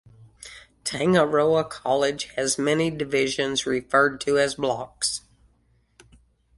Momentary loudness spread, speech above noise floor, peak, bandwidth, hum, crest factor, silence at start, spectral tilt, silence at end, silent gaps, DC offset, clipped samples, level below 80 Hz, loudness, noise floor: 13 LU; 41 dB; -6 dBFS; 11.5 kHz; none; 18 dB; 0.2 s; -3.5 dB/octave; 1.4 s; none; under 0.1%; under 0.1%; -58 dBFS; -23 LUFS; -64 dBFS